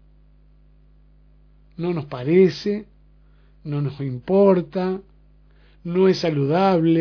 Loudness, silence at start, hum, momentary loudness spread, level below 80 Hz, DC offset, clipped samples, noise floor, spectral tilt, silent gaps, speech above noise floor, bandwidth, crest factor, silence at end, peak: -21 LUFS; 1.8 s; 50 Hz at -45 dBFS; 13 LU; -52 dBFS; under 0.1%; under 0.1%; -52 dBFS; -8 dB/octave; none; 33 dB; 5.4 kHz; 18 dB; 0 s; -4 dBFS